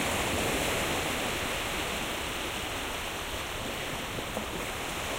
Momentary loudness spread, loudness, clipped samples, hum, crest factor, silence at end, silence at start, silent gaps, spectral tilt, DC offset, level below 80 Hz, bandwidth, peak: 6 LU; -31 LUFS; under 0.1%; none; 16 dB; 0 s; 0 s; none; -2.5 dB/octave; under 0.1%; -46 dBFS; 16 kHz; -16 dBFS